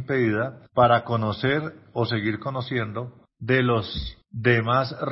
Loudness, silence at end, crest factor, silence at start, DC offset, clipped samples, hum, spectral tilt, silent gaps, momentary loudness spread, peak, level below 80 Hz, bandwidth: -24 LUFS; 0 s; 18 dB; 0 s; under 0.1%; under 0.1%; none; -10.5 dB/octave; none; 13 LU; -6 dBFS; -48 dBFS; 5.8 kHz